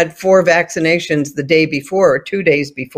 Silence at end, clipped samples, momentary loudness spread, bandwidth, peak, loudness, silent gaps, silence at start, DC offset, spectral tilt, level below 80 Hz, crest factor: 0.1 s; under 0.1%; 6 LU; 15.5 kHz; 0 dBFS; -14 LUFS; none; 0 s; under 0.1%; -5 dB/octave; -54 dBFS; 14 dB